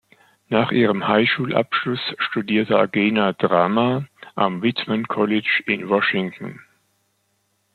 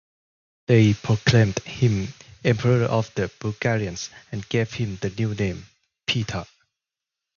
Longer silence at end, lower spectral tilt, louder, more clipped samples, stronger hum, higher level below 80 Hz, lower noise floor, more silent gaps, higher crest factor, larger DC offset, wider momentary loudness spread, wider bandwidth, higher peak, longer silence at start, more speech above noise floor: first, 1.2 s vs 0.95 s; first, -7.5 dB/octave vs -6 dB/octave; first, -20 LUFS vs -23 LUFS; neither; neither; second, -64 dBFS vs -48 dBFS; second, -68 dBFS vs -87 dBFS; neither; about the same, 18 dB vs 20 dB; neither; second, 7 LU vs 15 LU; second, 4.7 kHz vs 7.2 kHz; about the same, -2 dBFS vs -4 dBFS; second, 0.5 s vs 0.7 s; second, 48 dB vs 65 dB